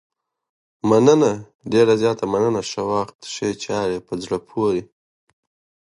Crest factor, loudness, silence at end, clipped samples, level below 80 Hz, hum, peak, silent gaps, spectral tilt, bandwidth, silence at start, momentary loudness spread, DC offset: 20 dB; -20 LUFS; 1 s; under 0.1%; -58 dBFS; none; -2 dBFS; 1.55-1.59 s, 3.15-3.19 s; -5.5 dB/octave; 11 kHz; 0.85 s; 11 LU; under 0.1%